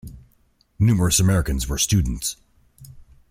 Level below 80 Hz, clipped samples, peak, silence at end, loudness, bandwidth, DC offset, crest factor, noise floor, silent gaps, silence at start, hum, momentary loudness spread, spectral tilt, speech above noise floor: -34 dBFS; under 0.1%; -4 dBFS; 0.3 s; -20 LUFS; 16.5 kHz; under 0.1%; 18 dB; -61 dBFS; none; 0.05 s; none; 10 LU; -4.5 dB/octave; 42 dB